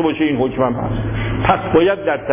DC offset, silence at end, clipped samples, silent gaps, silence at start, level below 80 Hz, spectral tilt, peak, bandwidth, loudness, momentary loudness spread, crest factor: under 0.1%; 0 s; under 0.1%; none; 0 s; -32 dBFS; -11 dB/octave; -2 dBFS; 3.7 kHz; -17 LUFS; 7 LU; 14 dB